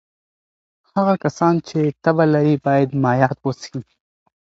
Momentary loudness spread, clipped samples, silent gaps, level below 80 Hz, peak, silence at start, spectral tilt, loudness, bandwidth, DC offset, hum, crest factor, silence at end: 10 LU; under 0.1%; none; -58 dBFS; 0 dBFS; 0.95 s; -8 dB/octave; -18 LUFS; 7.8 kHz; under 0.1%; none; 18 dB; 0.65 s